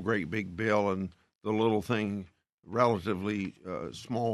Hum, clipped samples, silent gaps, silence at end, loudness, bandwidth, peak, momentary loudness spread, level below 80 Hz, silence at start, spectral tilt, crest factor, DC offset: none; under 0.1%; 1.35-1.39 s, 2.53-2.58 s; 0 s; -31 LUFS; 13 kHz; -10 dBFS; 12 LU; -66 dBFS; 0 s; -6.5 dB/octave; 20 dB; under 0.1%